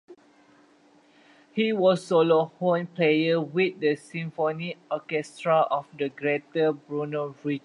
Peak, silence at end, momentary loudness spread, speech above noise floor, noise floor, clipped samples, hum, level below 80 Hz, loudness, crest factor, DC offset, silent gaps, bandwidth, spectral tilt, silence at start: -8 dBFS; 0.05 s; 10 LU; 34 dB; -59 dBFS; under 0.1%; none; -76 dBFS; -26 LUFS; 18 dB; under 0.1%; none; 11 kHz; -6.5 dB/octave; 0.1 s